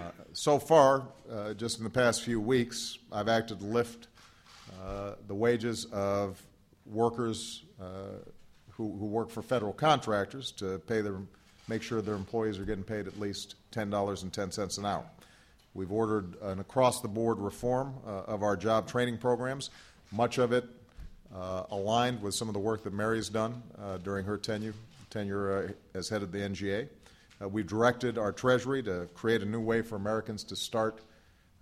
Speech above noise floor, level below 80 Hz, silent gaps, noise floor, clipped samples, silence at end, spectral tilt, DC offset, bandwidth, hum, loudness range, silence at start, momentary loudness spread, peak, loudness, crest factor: 30 dB; -60 dBFS; none; -62 dBFS; under 0.1%; 0.6 s; -5 dB/octave; under 0.1%; 15.5 kHz; none; 5 LU; 0 s; 14 LU; -8 dBFS; -32 LUFS; 24 dB